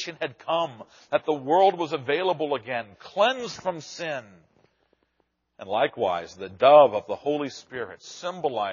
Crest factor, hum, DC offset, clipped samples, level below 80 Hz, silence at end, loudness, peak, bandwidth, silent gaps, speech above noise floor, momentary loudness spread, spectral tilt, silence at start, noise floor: 22 dB; none; under 0.1%; under 0.1%; -72 dBFS; 0 s; -24 LUFS; -4 dBFS; 7.2 kHz; none; 49 dB; 16 LU; -2.5 dB/octave; 0 s; -73 dBFS